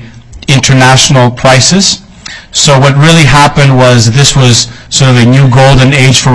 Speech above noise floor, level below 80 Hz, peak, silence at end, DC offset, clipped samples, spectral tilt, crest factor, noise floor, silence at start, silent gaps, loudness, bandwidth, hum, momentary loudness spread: 23 dB; -26 dBFS; 0 dBFS; 0 s; 2%; 5%; -4 dB/octave; 4 dB; -26 dBFS; 0 s; none; -4 LUFS; 11 kHz; none; 7 LU